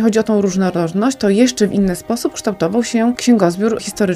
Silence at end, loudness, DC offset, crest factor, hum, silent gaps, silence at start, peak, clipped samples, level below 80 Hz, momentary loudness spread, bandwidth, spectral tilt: 0 s; -16 LUFS; under 0.1%; 14 dB; none; none; 0 s; -2 dBFS; under 0.1%; -46 dBFS; 6 LU; 15 kHz; -5.5 dB/octave